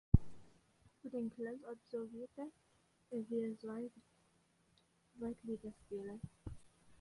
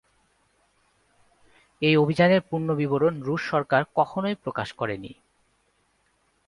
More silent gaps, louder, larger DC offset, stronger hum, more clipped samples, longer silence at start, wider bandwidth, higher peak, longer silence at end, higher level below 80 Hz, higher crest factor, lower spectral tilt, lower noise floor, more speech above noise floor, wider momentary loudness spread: neither; second, -45 LUFS vs -24 LUFS; neither; neither; neither; second, 0.15 s vs 1.8 s; about the same, 11.5 kHz vs 11.5 kHz; second, -12 dBFS vs -6 dBFS; second, 0.05 s vs 1.35 s; first, -52 dBFS vs -62 dBFS; first, 30 dB vs 20 dB; first, -9.5 dB/octave vs -7.5 dB/octave; first, -75 dBFS vs -68 dBFS; second, 30 dB vs 45 dB; about the same, 12 LU vs 11 LU